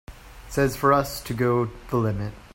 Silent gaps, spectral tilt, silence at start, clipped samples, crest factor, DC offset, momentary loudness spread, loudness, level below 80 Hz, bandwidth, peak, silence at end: none; -6 dB/octave; 0.1 s; under 0.1%; 18 dB; under 0.1%; 9 LU; -24 LUFS; -44 dBFS; 16.5 kHz; -6 dBFS; 0.15 s